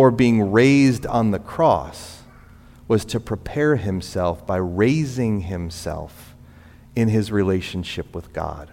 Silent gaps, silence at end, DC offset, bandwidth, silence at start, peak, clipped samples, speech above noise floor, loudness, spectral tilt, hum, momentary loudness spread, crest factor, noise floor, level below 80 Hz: none; 0.05 s; under 0.1%; 16 kHz; 0 s; -2 dBFS; under 0.1%; 26 dB; -21 LUFS; -7 dB/octave; 60 Hz at -50 dBFS; 15 LU; 18 dB; -46 dBFS; -42 dBFS